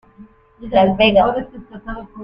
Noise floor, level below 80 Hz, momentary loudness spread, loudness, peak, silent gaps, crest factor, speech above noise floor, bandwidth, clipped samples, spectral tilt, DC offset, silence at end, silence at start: -45 dBFS; -40 dBFS; 21 LU; -15 LUFS; 0 dBFS; none; 18 dB; 28 dB; 5.4 kHz; under 0.1%; -8.5 dB/octave; under 0.1%; 0 s; 0.2 s